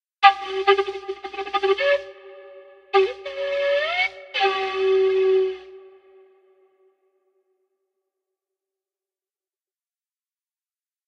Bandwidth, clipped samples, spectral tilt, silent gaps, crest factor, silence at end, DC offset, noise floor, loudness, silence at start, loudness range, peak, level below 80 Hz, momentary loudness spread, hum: 6.8 kHz; under 0.1%; -3 dB/octave; none; 24 dB; 5.2 s; under 0.1%; under -90 dBFS; -21 LUFS; 0.2 s; 4 LU; 0 dBFS; -66 dBFS; 12 LU; none